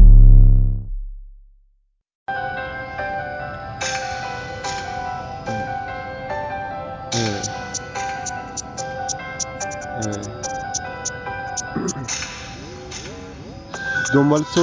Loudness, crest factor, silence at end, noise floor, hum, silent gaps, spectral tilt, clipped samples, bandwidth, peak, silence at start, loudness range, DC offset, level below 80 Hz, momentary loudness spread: -23 LUFS; 18 dB; 0 s; -62 dBFS; none; 2.15-2.26 s; -4.5 dB/octave; under 0.1%; 7.6 kHz; 0 dBFS; 0 s; 5 LU; under 0.1%; -20 dBFS; 15 LU